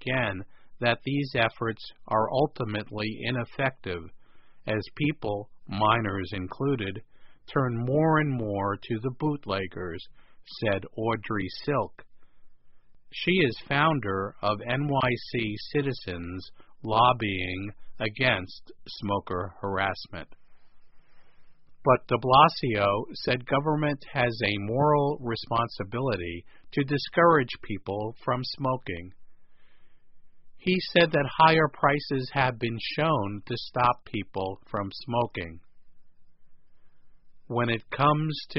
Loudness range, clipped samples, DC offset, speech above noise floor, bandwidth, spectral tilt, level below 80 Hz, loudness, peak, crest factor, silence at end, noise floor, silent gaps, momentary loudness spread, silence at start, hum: 7 LU; under 0.1%; under 0.1%; 22 dB; 5.8 kHz; -4 dB/octave; -56 dBFS; -27 LUFS; -4 dBFS; 24 dB; 0 s; -49 dBFS; none; 14 LU; 0 s; none